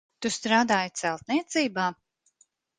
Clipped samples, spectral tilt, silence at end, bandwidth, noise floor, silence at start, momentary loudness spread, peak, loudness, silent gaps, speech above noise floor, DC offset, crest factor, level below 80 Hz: under 0.1%; -3 dB/octave; 0.85 s; 10 kHz; -67 dBFS; 0.2 s; 8 LU; -8 dBFS; -26 LUFS; none; 40 dB; under 0.1%; 20 dB; -70 dBFS